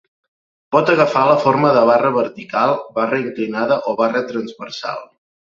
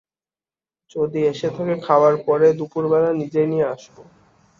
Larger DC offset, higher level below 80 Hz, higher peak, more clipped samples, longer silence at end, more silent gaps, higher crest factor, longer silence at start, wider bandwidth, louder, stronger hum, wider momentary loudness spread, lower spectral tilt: neither; about the same, -62 dBFS vs -62 dBFS; about the same, 0 dBFS vs -2 dBFS; neither; about the same, 0.55 s vs 0.55 s; neither; about the same, 16 dB vs 18 dB; second, 0.7 s vs 0.95 s; about the same, 7.4 kHz vs 7.4 kHz; first, -16 LUFS vs -19 LUFS; neither; first, 13 LU vs 9 LU; about the same, -6.5 dB/octave vs -7.5 dB/octave